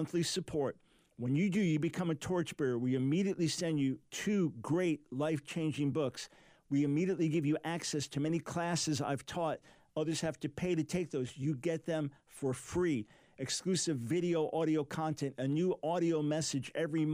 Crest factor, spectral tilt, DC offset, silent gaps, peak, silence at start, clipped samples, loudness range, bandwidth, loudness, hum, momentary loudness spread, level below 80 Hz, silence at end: 12 dB; -5.5 dB/octave; under 0.1%; none; -22 dBFS; 0 s; under 0.1%; 3 LU; 15.5 kHz; -35 LUFS; none; 6 LU; -68 dBFS; 0 s